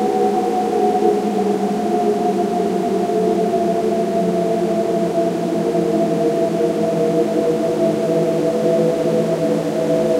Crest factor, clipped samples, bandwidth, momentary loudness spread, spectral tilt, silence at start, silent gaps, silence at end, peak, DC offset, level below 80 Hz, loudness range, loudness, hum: 14 dB; under 0.1%; 16 kHz; 2 LU; -7 dB/octave; 0 s; none; 0 s; -2 dBFS; under 0.1%; -56 dBFS; 1 LU; -18 LUFS; none